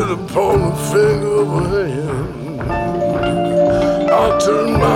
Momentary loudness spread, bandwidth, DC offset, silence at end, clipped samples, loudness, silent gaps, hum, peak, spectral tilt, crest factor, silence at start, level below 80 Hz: 8 LU; 16.5 kHz; under 0.1%; 0 s; under 0.1%; -16 LUFS; none; none; -2 dBFS; -6.5 dB/octave; 14 dB; 0 s; -32 dBFS